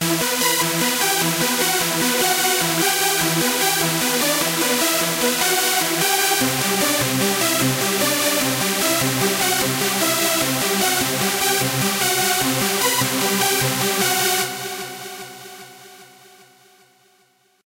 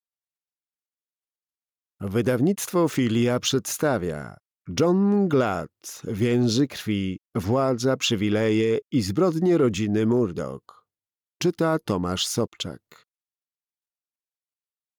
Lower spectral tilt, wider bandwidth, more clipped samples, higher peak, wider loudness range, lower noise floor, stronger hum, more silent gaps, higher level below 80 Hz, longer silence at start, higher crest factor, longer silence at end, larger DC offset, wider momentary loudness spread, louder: second, -2 dB/octave vs -5.5 dB/octave; second, 16 kHz vs over 20 kHz; neither; first, -4 dBFS vs -12 dBFS; about the same, 4 LU vs 6 LU; second, -60 dBFS vs under -90 dBFS; neither; neither; about the same, -56 dBFS vs -58 dBFS; second, 0 s vs 2 s; about the same, 16 dB vs 14 dB; second, 1.6 s vs 2.25 s; neither; second, 2 LU vs 12 LU; first, -18 LUFS vs -23 LUFS